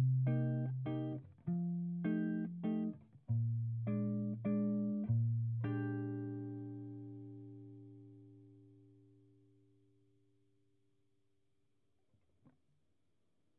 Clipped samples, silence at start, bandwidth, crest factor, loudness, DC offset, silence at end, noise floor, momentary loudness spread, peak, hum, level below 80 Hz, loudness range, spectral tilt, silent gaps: under 0.1%; 0 s; 3.4 kHz; 14 dB; -39 LUFS; under 0.1%; 4.85 s; -83 dBFS; 18 LU; -26 dBFS; none; -80 dBFS; 16 LU; -10.5 dB/octave; none